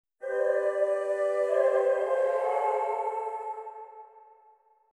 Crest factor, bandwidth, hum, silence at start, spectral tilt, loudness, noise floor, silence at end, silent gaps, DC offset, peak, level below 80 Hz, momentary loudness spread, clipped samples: 14 dB; 11 kHz; none; 0.2 s; -2.5 dB/octave; -28 LUFS; -62 dBFS; 0.75 s; none; under 0.1%; -14 dBFS; -86 dBFS; 14 LU; under 0.1%